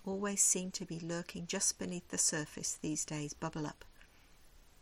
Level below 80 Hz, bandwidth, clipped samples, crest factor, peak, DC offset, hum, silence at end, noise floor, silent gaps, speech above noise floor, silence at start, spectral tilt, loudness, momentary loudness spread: -64 dBFS; 16.5 kHz; under 0.1%; 22 dB; -16 dBFS; under 0.1%; none; 0.2 s; -61 dBFS; none; 24 dB; 0 s; -2.5 dB/octave; -35 LUFS; 12 LU